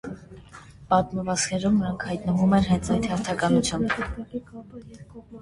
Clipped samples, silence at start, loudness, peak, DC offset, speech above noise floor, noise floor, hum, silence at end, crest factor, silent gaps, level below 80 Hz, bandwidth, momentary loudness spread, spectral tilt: under 0.1%; 0.05 s; -24 LUFS; -6 dBFS; under 0.1%; 22 dB; -46 dBFS; none; 0 s; 18 dB; none; -44 dBFS; 11.5 kHz; 23 LU; -5.5 dB/octave